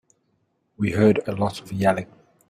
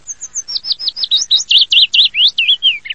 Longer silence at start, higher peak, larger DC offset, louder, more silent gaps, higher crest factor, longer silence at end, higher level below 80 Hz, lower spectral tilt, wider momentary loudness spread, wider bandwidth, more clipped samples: first, 0.8 s vs 0.1 s; second, -4 dBFS vs 0 dBFS; second, under 0.1% vs 0.6%; second, -22 LUFS vs -10 LUFS; neither; first, 20 dB vs 14 dB; first, 0.45 s vs 0 s; about the same, -56 dBFS vs -56 dBFS; first, -7 dB/octave vs 4.5 dB/octave; about the same, 10 LU vs 12 LU; first, 14.5 kHz vs 11 kHz; neither